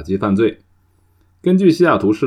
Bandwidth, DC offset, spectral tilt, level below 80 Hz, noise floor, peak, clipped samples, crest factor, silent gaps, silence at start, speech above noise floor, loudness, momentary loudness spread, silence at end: 10.5 kHz; under 0.1%; -8 dB/octave; -50 dBFS; -56 dBFS; -2 dBFS; under 0.1%; 14 dB; none; 0 s; 42 dB; -15 LUFS; 7 LU; 0 s